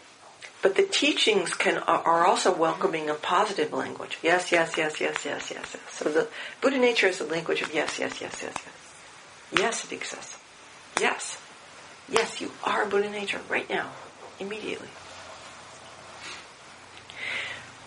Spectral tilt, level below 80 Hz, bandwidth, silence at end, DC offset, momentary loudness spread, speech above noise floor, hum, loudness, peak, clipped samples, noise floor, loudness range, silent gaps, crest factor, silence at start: -2.5 dB/octave; -70 dBFS; 10.5 kHz; 0 s; under 0.1%; 23 LU; 23 dB; none; -26 LUFS; 0 dBFS; under 0.1%; -49 dBFS; 11 LU; none; 28 dB; 0 s